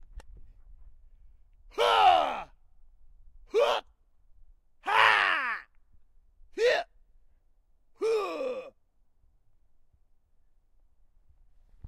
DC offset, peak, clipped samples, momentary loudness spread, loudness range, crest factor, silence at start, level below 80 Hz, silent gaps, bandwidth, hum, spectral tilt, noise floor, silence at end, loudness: under 0.1%; -6 dBFS; under 0.1%; 19 LU; 9 LU; 26 dB; 0.15 s; -58 dBFS; none; 14.5 kHz; none; -2 dB/octave; -65 dBFS; 0 s; -26 LUFS